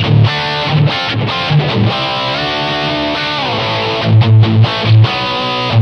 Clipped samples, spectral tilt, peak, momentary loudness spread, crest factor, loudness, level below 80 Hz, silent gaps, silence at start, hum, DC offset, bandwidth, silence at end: under 0.1%; -6.5 dB/octave; 0 dBFS; 6 LU; 12 dB; -12 LUFS; -40 dBFS; none; 0 s; none; under 0.1%; 6.4 kHz; 0 s